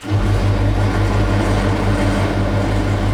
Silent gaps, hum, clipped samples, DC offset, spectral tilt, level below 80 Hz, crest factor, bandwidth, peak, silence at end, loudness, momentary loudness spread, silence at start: none; none; under 0.1%; under 0.1%; -7 dB/octave; -22 dBFS; 12 dB; 11.5 kHz; -4 dBFS; 0 s; -17 LUFS; 1 LU; 0 s